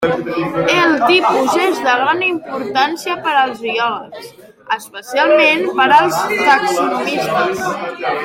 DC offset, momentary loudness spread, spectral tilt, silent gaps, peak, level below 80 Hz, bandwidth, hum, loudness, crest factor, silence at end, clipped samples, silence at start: under 0.1%; 11 LU; -3.5 dB/octave; none; 0 dBFS; -56 dBFS; 16.5 kHz; none; -14 LUFS; 14 dB; 0 s; under 0.1%; 0 s